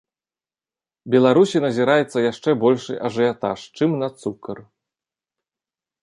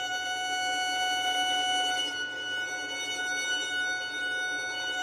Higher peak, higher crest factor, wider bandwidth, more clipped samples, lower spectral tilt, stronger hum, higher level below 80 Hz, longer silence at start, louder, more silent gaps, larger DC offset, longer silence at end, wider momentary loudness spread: first, -2 dBFS vs -16 dBFS; about the same, 18 dB vs 14 dB; second, 11.5 kHz vs 16 kHz; neither; first, -6.5 dB/octave vs 1 dB/octave; neither; first, -66 dBFS vs -72 dBFS; first, 1.05 s vs 0 s; first, -19 LUFS vs -29 LUFS; neither; neither; first, 1.4 s vs 0 s; first, 14 LU vs 6 LU